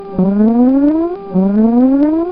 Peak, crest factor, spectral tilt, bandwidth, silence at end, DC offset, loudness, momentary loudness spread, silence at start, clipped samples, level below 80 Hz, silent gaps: 0 dBFS; 10 dB; -13.5 dB/octave; 4.9 kHz; 0 s; 0.6%; -12 LUFS; 5 LU; 0 s; under 0.1%; -40 dBFS; none